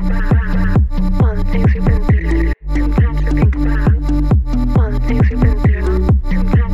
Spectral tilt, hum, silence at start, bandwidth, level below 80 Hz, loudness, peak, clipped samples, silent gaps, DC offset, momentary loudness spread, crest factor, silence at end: -9 dB/octave; none; 0 s; 7.4 kHz; -14 dBFS; -15 LUFS; -2 dBFS; under 0.1%; none; 1%; 3 LU; 10 dB; 0 s